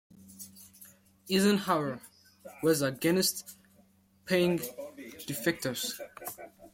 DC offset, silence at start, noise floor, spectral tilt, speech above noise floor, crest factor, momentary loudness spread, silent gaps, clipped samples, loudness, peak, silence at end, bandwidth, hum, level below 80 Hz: under 0.1%; 0.25 s; -64 dBFS; -4 dB/octave; 35 dB; 20 dB; 21 LU; none; under 0.1%; -30 LUFS; -12 dBFS; 0.05 s; 16.5 kHz; none; -70 dBFS